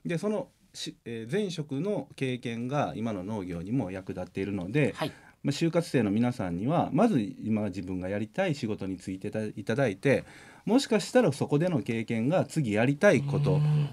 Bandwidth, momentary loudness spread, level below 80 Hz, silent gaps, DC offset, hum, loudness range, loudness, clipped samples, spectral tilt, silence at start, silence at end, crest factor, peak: 13 kHz; 11 LU; -66 dBFS; none; under 0.1%; none; 6 LU; -29 LUFS; under 0.1%; -6.5 dB/octave; 0.05 s; 0 s; 20 dB; -8 dBFS